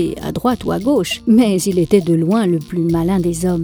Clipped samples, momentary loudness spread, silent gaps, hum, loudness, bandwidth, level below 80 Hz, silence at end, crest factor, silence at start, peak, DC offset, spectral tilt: under 0.1%; 6 LU; none; none; -16 LUFS; over 20 kHz; -40 dBFS; 0 s; 14 dB; 0 s; 0 dBFS; under 0.1%; -6.5 dB/octave